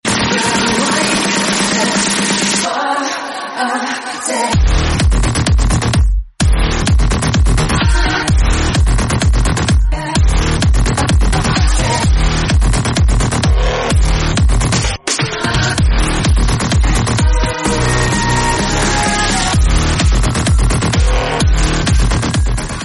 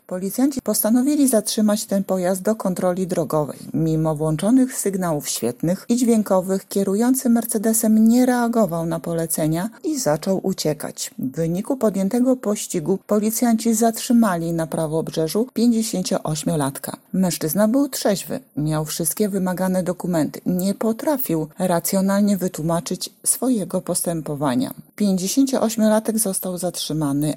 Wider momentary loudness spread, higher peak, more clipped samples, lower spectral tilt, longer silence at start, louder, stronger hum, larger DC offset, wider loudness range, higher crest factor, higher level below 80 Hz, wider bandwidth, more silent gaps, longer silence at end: second, 3 LU vs 6 LU; first, 0 dBFS vs -4 dBFS; neither; about the same, -4 dB/octave vs -5 dB/octave; about the same, 0.05 s vs 0.1 s; first, -14 LUFS vs -20 LUFS; neither; neither; about the same, 1 LU vs 3 LU; about the same, 12 dB vs 16 dB; first, -16 dBFS vs -54 dBFS; second, 11.5 kHz vs 17.5 kHz; neither; about the same, 0 s vs 0 s